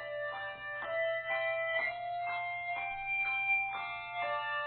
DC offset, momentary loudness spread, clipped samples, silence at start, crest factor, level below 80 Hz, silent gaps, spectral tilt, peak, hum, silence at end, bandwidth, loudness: under 0.1%; 8 LU; under 0.1%; 0 s; 14 dB; -68 dBFS; none; 1.5 dB/octave; -22 dBFS; none; 0 s; 4.6 kHz; -34 LUFS